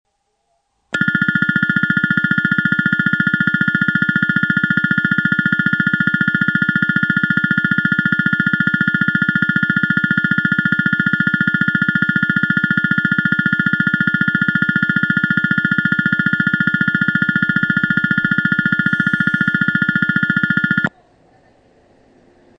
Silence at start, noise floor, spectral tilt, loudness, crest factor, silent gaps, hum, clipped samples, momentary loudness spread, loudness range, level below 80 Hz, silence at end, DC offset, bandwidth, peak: 0.95 s; -67 dBFS; -7 dB/octave; -15 LUFS; 16 dB; none; none; under 0.1%; 0 LU; 1 LU; -52 dBFS; 1.7 s; under 0.1%; 7.8 kHz; 0 dBFS